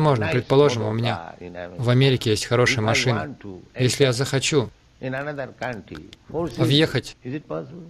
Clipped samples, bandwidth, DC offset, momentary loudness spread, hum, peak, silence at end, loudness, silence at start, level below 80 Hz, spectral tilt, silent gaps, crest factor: under 0.1%; 13.5 kHz; under 0.1%; 17 LU; none; -6 dBFS; 0 s; -21 LUFS; 0 s; -52 dBFS; -5 dB/octave; none; 16 dB